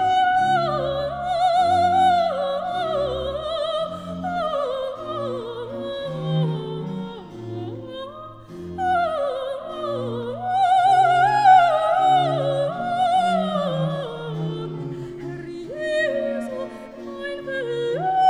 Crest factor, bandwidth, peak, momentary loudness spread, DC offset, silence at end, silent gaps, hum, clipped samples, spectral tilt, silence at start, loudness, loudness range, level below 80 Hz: 18 dB; 11 kHz; -4 dBFS; 16 LU; under 0.1%; 0 s; none; none; under 0.1%; -6 dB/octave; 0 s; -22 LUFS; 10 LU; -52 dBFS